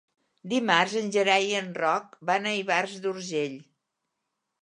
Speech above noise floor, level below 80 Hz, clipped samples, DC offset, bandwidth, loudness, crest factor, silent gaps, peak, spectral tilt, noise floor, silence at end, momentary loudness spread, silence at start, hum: 56 dB; -82 dBFS; under 0.1%; under 0.1%; 11 kHz; -26 LUFS; 24 dB; none; -4 dBFS; -3.5 dB/octave; -82 dBFS; 1 s; 9 LU; 0.45 s; none